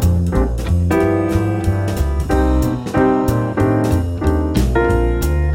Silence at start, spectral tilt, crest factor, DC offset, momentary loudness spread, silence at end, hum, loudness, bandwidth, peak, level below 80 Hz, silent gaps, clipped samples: 0 s; -7.5 dB/octave; 14 dB; under 0.1%; 3 LU; 0 s; none; -17 LUFS; 17.5 kHz; -2 dBFS; -20 dBFS; none; under 0.1%